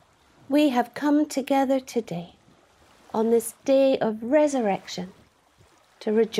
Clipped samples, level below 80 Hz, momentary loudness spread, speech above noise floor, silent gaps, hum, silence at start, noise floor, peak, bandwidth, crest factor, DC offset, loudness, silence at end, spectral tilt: under 0.1%; -68 dBFS; 14 LU; 36 dB; none; none; 0.5 s; -59 dBFS; -8 dBFS; 15.5 kHz; 16 dB; under 0.1%; -24 LUFS; 0 s; -5 dB/octave